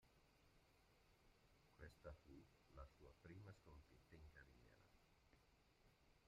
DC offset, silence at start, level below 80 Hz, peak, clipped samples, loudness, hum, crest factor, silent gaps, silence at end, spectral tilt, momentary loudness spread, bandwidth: under 0.1%; 0 s; -74 dBFS; -46 dBFS; under 0.1%; -66 LUFS; none; 22 dB; none; 0 s; -6 dB/octave; 6 LU; 11 kHz